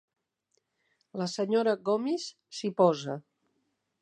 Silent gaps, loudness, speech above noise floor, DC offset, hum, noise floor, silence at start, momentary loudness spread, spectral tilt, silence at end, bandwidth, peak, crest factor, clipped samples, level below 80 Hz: none; -29 LUFS; 49 dB; under 0.1%; none; -78 dBFS; 1.15 s; 14 LU; -5.5 dB/octave; 0.8 s; 10.5 kHz; -10 dBFS; 22 dB; under 0.1%; -84 dBFS